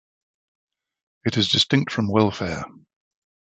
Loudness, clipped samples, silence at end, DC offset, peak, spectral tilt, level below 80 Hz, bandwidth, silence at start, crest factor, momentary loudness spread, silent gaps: -21 LUFS; under 0.1%; 0.75 s; under 0.1%; -4 dBFS; -5 dB/octave; -50 dBFS; 8.4 kHz; 1.25 s; 22 dB; 12 LU; none